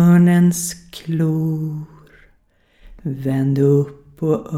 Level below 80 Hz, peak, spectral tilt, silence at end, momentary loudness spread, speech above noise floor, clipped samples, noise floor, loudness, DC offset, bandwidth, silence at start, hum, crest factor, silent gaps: -50 dBFS; -4 dBFS; -7 dB/octave; 0 s; 17 LU; 40 dB; under 0.1%; -57 dBFS; -18 LUFS; under 0.1%; 14.5 kHz; 0 s; none; 14 dB; none